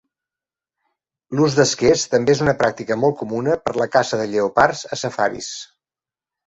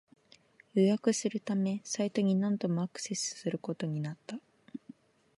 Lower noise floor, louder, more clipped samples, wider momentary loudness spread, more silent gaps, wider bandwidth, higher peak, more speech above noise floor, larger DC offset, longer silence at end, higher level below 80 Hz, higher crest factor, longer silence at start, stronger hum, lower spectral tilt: first, under -90 dBFS vs -63 dBFS; first, -19 LUFS vs -32 LUFS; neither; second, 10 LU vs 18 LU; neither; second, 8.2 kHz vs 11.5 kHz; first, -2 dBFS vs -14 dBFS; first, over 72 dB vs 31 dB; neither; first, 0.8 s vs 0.6 s; first, -52 dBFS vs -82 dBFS; about the same, 18 dB vs 20 dB; first, 1.3 s vs 0.75 s; neither; about the same, -4.5 dB/octave vs -5.5 dB/octave